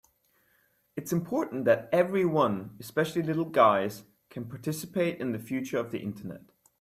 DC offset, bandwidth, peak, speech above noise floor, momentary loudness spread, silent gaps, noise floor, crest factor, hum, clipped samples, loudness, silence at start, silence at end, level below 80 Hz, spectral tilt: under 0.1%; 16 kHz; -8 dBFS; 41 dB; 19 LU; none; -69 dBFS; 22 dB; none; under 0.1%; -28 LUFS; 0.95 s; 0.4 s; -70 dBFS; -6 dB/octave